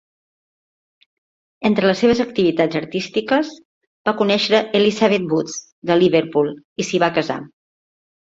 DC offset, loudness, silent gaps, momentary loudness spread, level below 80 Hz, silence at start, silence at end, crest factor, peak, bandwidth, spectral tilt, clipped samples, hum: under 0.1%; -18 LUFS; 3.65-3.81 s, 3.87-4.05 s, 5.72-5.82 s, 6.65-6.76 s; 10 LU; -58 dBFS; 1.6 s; 0.8 s; 18 dB; -2 dBFS; 7.8 kHz; -5 dB/octave; under 0.1%; none